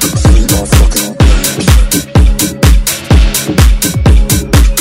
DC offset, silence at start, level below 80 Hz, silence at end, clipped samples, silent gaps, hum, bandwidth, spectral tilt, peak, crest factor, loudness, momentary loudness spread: under 0.1%; 0 s; -8 dBFS; 0 s; 3%; none; none; 16.5 kHz; -4.5 dB/octave; 0 dBFS; 6 dB; -9 LUFS; 2 LU